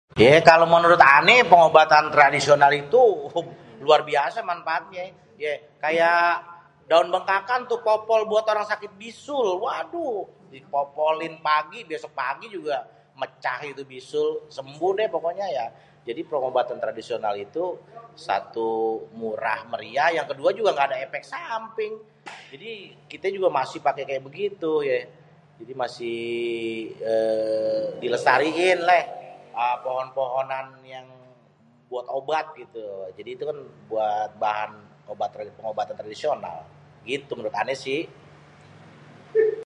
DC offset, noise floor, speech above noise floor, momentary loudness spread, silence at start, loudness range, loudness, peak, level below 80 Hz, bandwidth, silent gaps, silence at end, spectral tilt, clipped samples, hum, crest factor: under 0.1%; -57 dBFS; 35 dB; 20 LU; 0.15 s; 11 LU; -22 LUFS; 0 dBFS; -64 dBFS; 11 kHz; none; 0 s; -4.5 dB/octave; under 0.1%; none; 24 dB